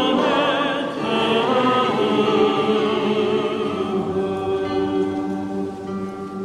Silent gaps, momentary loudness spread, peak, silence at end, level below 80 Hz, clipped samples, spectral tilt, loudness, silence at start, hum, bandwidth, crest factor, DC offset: none; 9 LU; -6 dBFS; 0 s; -56 dBFS; under 0.1%; -6 dB/octave; -20 LUFS; 0 s; none; 11.5 kHz; 14 dB; under 0.1%